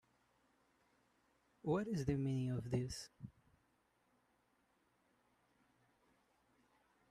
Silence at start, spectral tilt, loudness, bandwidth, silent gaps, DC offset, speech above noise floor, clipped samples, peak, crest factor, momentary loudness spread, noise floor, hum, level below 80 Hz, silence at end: 1.65 s; -7 dB/octave; -41 LUFS; 13.5 kHz; none; under 0.1%; 39 dB; under 0.1%; -26 dBFS; 22 dB; 16 LU; -79 dBFS; none; -68 dBFS; 3.8 s